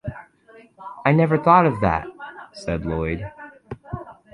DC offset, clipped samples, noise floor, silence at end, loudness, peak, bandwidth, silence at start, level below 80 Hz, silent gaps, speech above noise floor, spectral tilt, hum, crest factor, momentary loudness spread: under 0.1%; under 0.1%; -50 dBFS; 0.2 s; -20 LUFS; -2 dBFS; 10 kHz; 0.05 s; -42 dBFS; none; 31 dB; -8.5 dB/octave; none; 20 dB; 23 LU